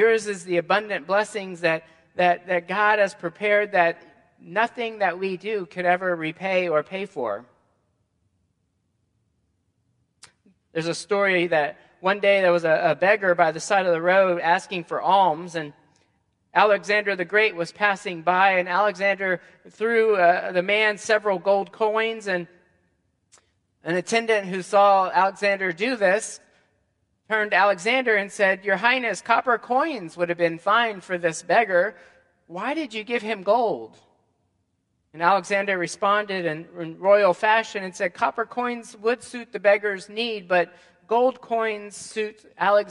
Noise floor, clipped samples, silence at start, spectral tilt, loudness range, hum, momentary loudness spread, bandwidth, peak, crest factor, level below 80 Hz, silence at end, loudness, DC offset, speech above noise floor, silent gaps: -72 dBFS; under 0.1%; 0 s; -4 dB/octave; 6 LU; none; 10 LU; 11.5 kHz; -2 dBFS; 22 dB; -74 dBFS; 0 s; -22 LUFS; under 0.1%; 50 dB; none